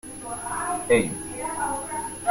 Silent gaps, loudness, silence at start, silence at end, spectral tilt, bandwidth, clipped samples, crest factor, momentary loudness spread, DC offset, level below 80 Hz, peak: none; -26 LUFS; 0.05 s; 0 s; -3.5 dB/octave; 16.5 kHz; under 0.1%; 20 dB; 10 LU; under 0.1%; -52 dBFS; -8 dBFS